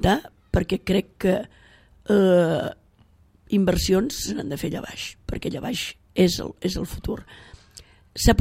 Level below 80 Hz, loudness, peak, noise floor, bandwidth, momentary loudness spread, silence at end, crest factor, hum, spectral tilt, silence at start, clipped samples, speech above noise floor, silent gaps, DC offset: -36 dBFS; -24 LUFS; -2 dBFS; -57 dBFS; 16 kHz; 13 LU; 0 s; 22 dB; none; -5.5 dB/octave; 0 s; under 0.1%; 34 dB; none; under 0.1%